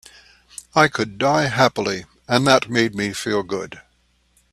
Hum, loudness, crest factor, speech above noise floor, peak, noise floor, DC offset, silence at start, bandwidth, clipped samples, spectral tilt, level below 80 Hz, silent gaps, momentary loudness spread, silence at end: 60 Hz at -50 dBFS; -19 LUFS; 20 dB; 43 dB; 0 dBFS; -62 dBFS; under 0.1%; 0.75 s; 14 kHz; under 0.1%; -4.5 dB/octave; -54 dBFS; none; 14 LU; 0.7 s